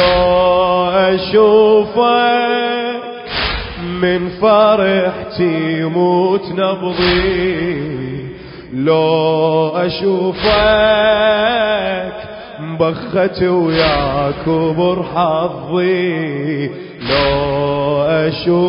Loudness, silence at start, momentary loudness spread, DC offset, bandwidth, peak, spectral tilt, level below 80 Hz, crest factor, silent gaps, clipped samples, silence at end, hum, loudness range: -14 LUFS; 0 s; 11 LU; under 0.1%; 5.4 kHz; 0 dBFS; -10.5 dB/octave; -36 dBFS; 14 dB; none; under 0.1%; 0 s; none; 3 LU